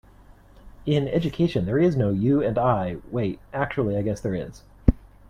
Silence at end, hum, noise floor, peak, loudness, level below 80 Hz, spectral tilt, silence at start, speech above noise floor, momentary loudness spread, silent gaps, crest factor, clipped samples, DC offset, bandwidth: 0.25 s; none; -50 dBFS; -2 dBFS; -24 LUFS; -36 dBFS; -8.5 dB/octave; 0.65 s; 27 dB; 8 LU; none; 22 dB; under 0.1%; under 0.1%; 11 kHz